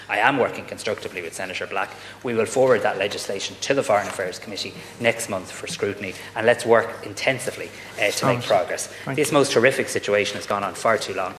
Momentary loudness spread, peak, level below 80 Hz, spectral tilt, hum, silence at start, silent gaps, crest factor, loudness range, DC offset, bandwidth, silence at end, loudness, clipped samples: 11 LU; -2 dBFS; -62 dBFS; -3.5 dB/octave; none; 0 s; none; 20 dB; 3 LU; under 0.1%; 14 kHz; 0 s; -23 LUFS; under 0.1%